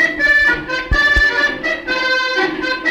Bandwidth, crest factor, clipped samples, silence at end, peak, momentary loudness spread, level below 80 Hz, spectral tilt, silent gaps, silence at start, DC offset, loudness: over 20 kHz; 12 dB; under 0.1%; 0 s; -4 dBFS; 7 LU; -28 dBFS; -3.5 dB/octave; none; 0 s; under 0.1%; -14 LUFS